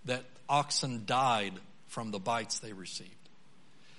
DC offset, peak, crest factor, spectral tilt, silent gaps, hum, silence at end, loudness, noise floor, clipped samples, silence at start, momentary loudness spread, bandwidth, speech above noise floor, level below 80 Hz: 0.3%; -14 dBFS; 20 dB; -3 dB/octave; none; none; 0.9 s; -33 LUFS; -64 dBFS; under 0.1%; 0.05 s; 14 LU; 11.5 kHz; 30 dB; -76 dBFS